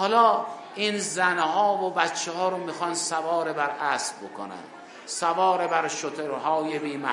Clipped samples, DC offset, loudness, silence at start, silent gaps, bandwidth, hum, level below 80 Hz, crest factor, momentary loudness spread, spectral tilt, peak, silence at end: under 0.1%; under 0.1%; -25 LUFS; 0 s; none; 11 kHz; none; -86 dBFS; 20 dB; 14 LU; -2.5 dB/octave; -6 dBFS; 0 s